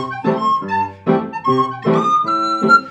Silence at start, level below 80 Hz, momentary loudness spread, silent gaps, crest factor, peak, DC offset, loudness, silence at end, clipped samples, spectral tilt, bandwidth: 0 s; -64 dBFS; 6 LU; none; 16 dB; 0 dBFS; under 0.1%; -16 LUFS; 0 s; under 0.1%; -6.5 dB/octave; 10 kHz